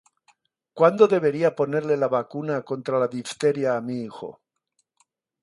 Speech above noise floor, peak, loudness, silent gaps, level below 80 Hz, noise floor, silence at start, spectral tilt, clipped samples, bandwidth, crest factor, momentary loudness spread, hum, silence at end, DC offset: 52 dB; -2 dBFS; -23 LUFS; none; -72 dBFS; -74 dBFS; 0.75 s; -6.5 dB/octave; under 0.1%; 11.5 kHz; 22 dB; 13 LU; none; 1.1 s; under 0.1%